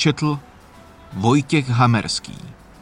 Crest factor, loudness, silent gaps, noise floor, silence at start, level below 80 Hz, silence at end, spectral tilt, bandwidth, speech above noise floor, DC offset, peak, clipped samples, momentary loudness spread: 18 dB; -19 LUFS; none; -45 dBFS; 0 s; -50 dBFS; 0.3 s; -5.5 dB/octave; 11 kHz; 26 dB; under 0.1%; -4 dBFS; under 0.1%; 20 LU